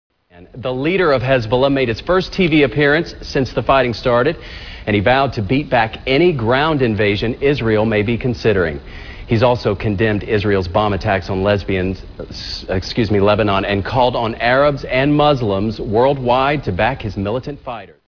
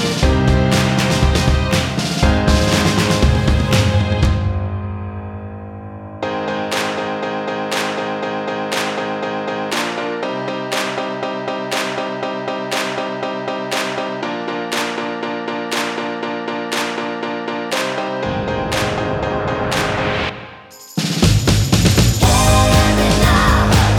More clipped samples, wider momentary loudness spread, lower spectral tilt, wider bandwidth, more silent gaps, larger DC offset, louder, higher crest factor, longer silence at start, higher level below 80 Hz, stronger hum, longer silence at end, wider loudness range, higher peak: neither; about the same, 10 LU vs 10 LU; first, -7 dB/octave vs -5 dB/octave; second, 5.4 kHz vs 19 kHz; neither; neither; about the same, -16 LUFS vs -18 LUFS; about the same, 16 dB vs 16 dB; first, 0.35 s vs 0 s; second, -34 dBFS vs -26 dBFS; neither; first, 0.25 s vs 0 s; second, 2 LU vs 7 LU; about the same, 0 dBFS vs 0 dBFS